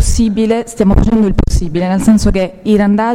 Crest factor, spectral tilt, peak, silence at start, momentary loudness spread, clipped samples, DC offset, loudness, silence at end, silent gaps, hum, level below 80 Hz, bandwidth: 10 dB; -6.5 dB/octave; 0 dBFS; 0 s; 5 LU; under 0.1%; under 0.1%; -12 LUFS; 0 s; none; none; -18 dBFS; 14 kHz